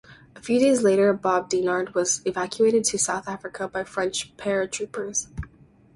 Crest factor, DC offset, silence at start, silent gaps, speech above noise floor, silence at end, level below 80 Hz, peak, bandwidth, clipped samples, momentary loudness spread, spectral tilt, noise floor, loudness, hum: 16 dB; under 0.1%; 0.1 s; none; 30 dB; 0.5 s; -52 dBFS; -8 dBFS; 11.5 kHz; under 0.1%; 12 LU; -3.5 dB/octave; -53 dBFS; -23 LUFS; none